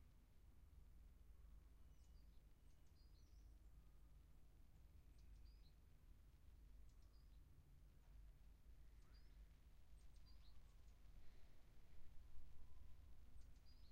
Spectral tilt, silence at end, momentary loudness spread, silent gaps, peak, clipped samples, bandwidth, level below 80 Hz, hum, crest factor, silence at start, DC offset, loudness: -5.5 dB/octave; 0 s; 1 LU; none; -42 dBFS; under 0.1%; 15 kHz; -66 dBFS; none; 18 dB; 0 s; under 0.1%; -69 LUFS